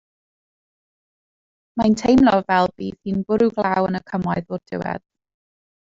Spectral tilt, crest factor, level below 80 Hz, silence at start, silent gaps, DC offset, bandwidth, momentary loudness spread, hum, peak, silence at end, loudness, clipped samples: -6.5 dB/octave; 18 dB; -50 dBFS; 1.75 s; none; under 0.1%; 7.8 kHz; 14 LU; none; -4 dBFS; 0.9 s; -20 LUFS; under 0.1%